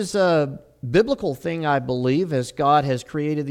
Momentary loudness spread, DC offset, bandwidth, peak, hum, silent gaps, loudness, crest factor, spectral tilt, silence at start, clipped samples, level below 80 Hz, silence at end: 7 LU; under 0.1%; 16 kHz; -6 dBFS; none; none; -21 LUFS; 16 dB; -6.5 dB/octave; 0 s; under 0.1%; -52 dBFS; 0 s